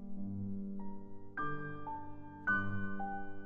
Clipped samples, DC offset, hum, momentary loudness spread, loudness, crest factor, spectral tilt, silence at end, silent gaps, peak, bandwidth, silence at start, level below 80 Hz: under 0.1%; under 0.1%; none; 12 LU; -41 LUFS; 16 dB; -6 dB/octave; 0 s; none; -22 dBFS; 3.4 kHz; 0 s; -56 dBFS